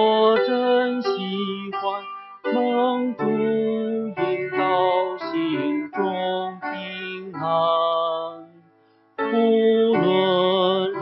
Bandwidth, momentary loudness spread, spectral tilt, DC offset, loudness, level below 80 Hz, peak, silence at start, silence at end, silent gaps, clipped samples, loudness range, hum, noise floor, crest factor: 6 kHz; 11 LU; -8 dB/octave; under 0.1%; -22 LUFS; -72 dBFS; -6 dBFS; 0 s; 0 s; none; under 0.1%; 4 LU; none; -58 dBFS; 16 dB